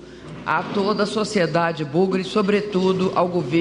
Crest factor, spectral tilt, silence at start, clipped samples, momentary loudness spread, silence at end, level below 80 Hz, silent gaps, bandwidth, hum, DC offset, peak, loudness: 14 dB; -6 dB/octave; 0 s; under 0.1%; 4 LU; 0 s; -56 dBFS; none; 11 kHz; none; under 0.1%; -6 dBFS; -21 LUFS